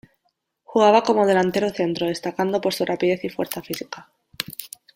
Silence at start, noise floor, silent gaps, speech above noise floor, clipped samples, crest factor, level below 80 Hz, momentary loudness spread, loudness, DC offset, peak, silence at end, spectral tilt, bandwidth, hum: 0.7 s; -72 dBFS; none; 52 dB; under 0.1%; 20 dB; -62 dBFS; 15 LU; -22 LUFS; under 0.1%; -2 dBFS; 0.3 s; -5 dB/octave; 16.5 kHz; none